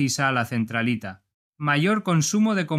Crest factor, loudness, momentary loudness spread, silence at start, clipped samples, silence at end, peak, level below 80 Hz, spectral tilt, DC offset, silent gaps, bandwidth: 16 dB; -23 LUFS; 8 LU; 0 s; under 0.1%; 0 s; -6 dBFS; -66 dBFS; -4.5 dB/octave; under 0.1%; 1.34-1.53 s; 15 kHz